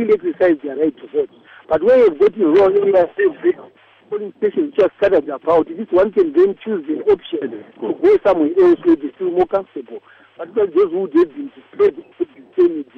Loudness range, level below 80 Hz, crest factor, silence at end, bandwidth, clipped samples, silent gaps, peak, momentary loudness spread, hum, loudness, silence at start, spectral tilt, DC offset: 4 LU; -54 dBFS; 12 dB; 0.15 s; 5.2 kHz; under 0.1%; none; -4 dBFS; 14 LU; none; -16 LUFS; 0 s; -8 dB/octave; under 0.1%